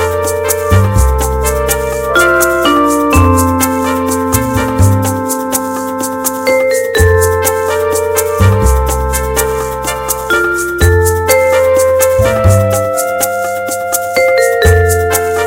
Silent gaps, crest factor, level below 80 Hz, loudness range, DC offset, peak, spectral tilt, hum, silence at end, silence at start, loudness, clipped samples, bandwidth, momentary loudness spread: none; 10 dB; -22 dBFS; 2 LU; under 0.1%; 0 dBFS; -5 dB/octave; none; 0 s; 0 s; -11 LUFS; 0.2%; 17 kHz; 6 LU